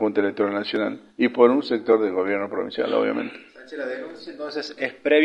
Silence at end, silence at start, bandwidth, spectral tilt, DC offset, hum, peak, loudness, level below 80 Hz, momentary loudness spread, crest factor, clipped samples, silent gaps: 0 s; 0 s; 7.4 kHz; -6 dB/octave; under 0.1%; none; -2 dBFS; -23 LUFS; -72 dBFS; 16 LU; 20 dB; under 0.1%; none